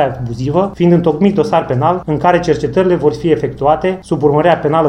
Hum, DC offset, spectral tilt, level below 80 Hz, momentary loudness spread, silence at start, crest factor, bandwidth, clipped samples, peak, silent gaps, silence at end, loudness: none; under 0.1%; -8 dB/octave; -38 dBFS; 4 LU; 0 s; 12 dB; 10.5 kHz; under 0.1%; 0 dBFS; none; 0 s; -13 LUFS